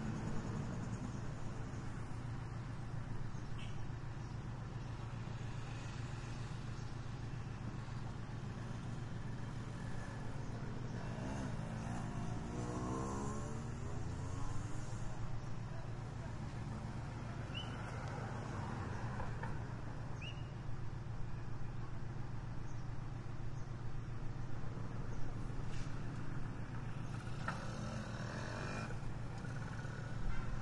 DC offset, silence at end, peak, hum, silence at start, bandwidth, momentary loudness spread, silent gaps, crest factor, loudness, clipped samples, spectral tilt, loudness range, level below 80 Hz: under 0.1%; 0 s; -24 dBFS; none; 0 s; 11 kHz; 4 LU; none; 18 dB; -46 LUFS; under 0.1%; -6.5 dB/octave; 3 LU; -50 dBFS